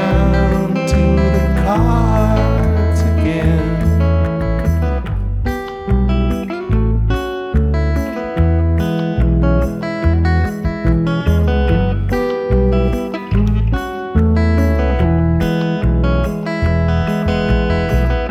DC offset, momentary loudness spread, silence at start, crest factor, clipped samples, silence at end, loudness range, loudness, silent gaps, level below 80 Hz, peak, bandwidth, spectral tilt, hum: under 0.1%; 5 LU; 0 s; 12 dB; under 0.1%; 0 s; 3 LU; -16 LUFS; none; -18 dBFS; -2 dBFS; 12.5 kHz; -8 dB/octave; none